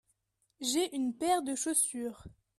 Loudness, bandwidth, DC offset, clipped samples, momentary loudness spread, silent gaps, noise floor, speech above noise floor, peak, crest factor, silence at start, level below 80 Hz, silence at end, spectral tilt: -32 LUFS; 14.5 kHz; under 0.1%; under 0.1%; 9 LU; none; -77 dBFS; 45 dB; -16 dBFS; 18 dB; 0.6 s; -66 dBFS; 0.25 s; -1.5 dB/octave